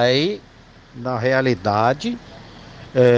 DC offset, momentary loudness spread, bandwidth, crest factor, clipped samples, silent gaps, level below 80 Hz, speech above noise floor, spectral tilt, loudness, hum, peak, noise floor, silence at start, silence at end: under 0.1%; 23 LU; 7.6 kHz; 16 dB; under 0.1%; none; -52 dBFS; 21 dB; -6 dB/octave; -20 LUFS; none; -4 dBFS; -40 dBFS; 0 s; 0 s